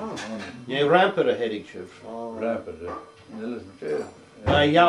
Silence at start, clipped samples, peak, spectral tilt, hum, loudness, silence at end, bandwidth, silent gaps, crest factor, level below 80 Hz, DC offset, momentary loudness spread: 0 s; under 0.1%; -2 dBFS; -6 dB/octave; none; -25 LUFS; 0 s; 11.5 kHz; none; 22 dB; -52 dBFS; under 0.1%; 20 LU